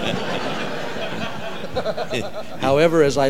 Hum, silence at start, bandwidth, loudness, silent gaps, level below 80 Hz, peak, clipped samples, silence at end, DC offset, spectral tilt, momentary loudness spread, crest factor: none; 0 s; 16.5 kHz; -23 LUFS; none; -50 dBFS; -2 dBFS; under 0.1%; 0 s; 4%; -5 dB/octave; 12 LU; 20 dB